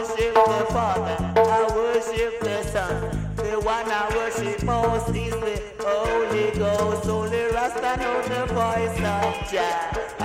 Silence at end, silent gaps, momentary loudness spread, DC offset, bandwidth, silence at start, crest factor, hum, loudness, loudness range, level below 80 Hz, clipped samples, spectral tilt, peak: 0 s; none; 7 LU; under 0.1%; 16 kHz; 0 s; 18 dB; none; -23 LUFS; 2 LU; -38 dBFS; under 0.1%; -5 dB/octave; -6 dBFS